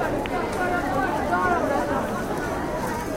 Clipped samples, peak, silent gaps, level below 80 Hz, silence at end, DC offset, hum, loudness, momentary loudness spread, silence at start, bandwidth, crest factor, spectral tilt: under 0.1%; -10 dBFS; none; -40 dBFS; 0 s; under 0.1%; none; -25 LUFS; 5 LU; 0 s; 17 kHz; 16 dB; -5.5 dB/octave